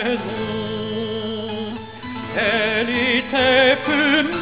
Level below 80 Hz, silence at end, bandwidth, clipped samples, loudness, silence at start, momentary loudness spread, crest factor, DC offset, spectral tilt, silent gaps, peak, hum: -48 dBFS; 0 s; 4 kHz; under 0.1%; -19 LUFS; 0 s; 13 LU; 16 dB; 0.4%; -8 dB/octave; none; -4 dBFS; none